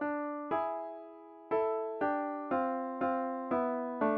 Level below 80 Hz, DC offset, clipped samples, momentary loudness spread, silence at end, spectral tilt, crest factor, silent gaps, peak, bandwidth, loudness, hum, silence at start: -74 dBFS; under 0.1%; under 0.1%; 9 LU; 0 s; -5 dB/octave; 16 dB; none; -18 dBFS; 5.2 kHz; -35 LUFS; none; 0 s